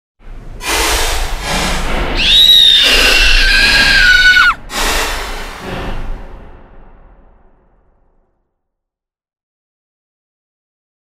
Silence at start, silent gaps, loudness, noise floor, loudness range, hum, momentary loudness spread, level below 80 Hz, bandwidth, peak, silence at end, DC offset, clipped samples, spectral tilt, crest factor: 0.25 s; none; -8 LUFS; -83 dBFS; 18 LU; none; 20 LU; -22 dBFS; 16.5 kHz; 0 dBFS; 4.3 s; under 0.1%; under 0.1%; -1 dB/octave; 14 dB